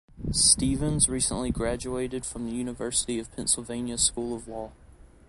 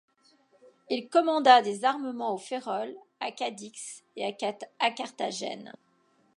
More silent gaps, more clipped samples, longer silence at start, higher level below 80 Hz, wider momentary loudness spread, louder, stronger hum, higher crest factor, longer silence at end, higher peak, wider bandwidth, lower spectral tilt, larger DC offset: neither; neither; second, 0.15 s vs 0.9 s; first, -42 dBFS vs -88 dBFS; second, 14 LU vs 20 LU; about the same, -26 LUFS vs -28 LUFS; neither; about the same, 22 dB vs 24 dB; second, 0.25 s vs 0.65 s; about the same, -6 dBFS vs -4 dBFS; about the same, 11.5 kHz vs 11.5 kHz; about the same, -3 dB/octave vs -3 dB/octave; neither